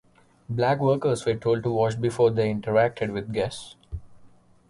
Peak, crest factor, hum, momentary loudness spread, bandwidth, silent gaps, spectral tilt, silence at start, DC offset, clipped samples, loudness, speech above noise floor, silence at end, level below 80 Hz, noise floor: -8 dBFS; 16 dB; none; 17 LU; 11.5 kHz; none; -6.5 dB/octave; 0.5 s; under 0.1%; under 0.1%; -24 LUFS; 29 dB; 0.45 s; -50 dBFS; -53 dBFS